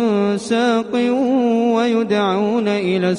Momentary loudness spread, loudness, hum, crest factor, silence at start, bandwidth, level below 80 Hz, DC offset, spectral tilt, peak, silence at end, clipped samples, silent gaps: 2 LU; -17 LUFS; none; 12 dB; 0 s; 11 kHz; -62 dBFS; under 0.1%; -6 dB/octave; -4 dBFS; 0 s; under 0.1%; none